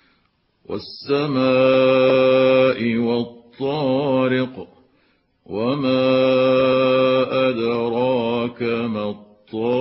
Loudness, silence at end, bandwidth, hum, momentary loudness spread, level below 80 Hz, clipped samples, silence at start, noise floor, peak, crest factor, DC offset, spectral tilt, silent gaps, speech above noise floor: -18 LUFS; 0 s; 5.8 kHz; none; 15 LU; -58 dBFS; under 0.1%; 0.7 s; -64 dBFS; -6 dBFS; 14 dB; under 0.1%; -10.5 dB/octave; none; 46 dB